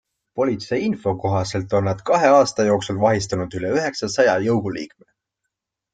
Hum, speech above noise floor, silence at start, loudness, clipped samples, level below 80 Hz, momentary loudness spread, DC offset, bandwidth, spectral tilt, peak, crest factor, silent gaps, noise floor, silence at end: none; 61 dB; 0.35 s; -20 LUFS; under 0.1%; -54 dBFS; 10 LU; under 0.1%; 9.4 kHz; -5.5 dB/octave; -2 dBFS; 18 dB; none; -81 dBFS; 1.05 s